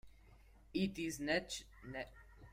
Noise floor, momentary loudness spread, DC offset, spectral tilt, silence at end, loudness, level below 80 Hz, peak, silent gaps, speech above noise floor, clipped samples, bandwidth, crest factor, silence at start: -63 dBFS; 13 LU; under 0.1%; -4 dB/octave; 0 s; -42 LUFS; -62 dBFS; -24 dBFS; none; 22 dB; under 0.1%; 16 kHz; 20 dB; 0.05 s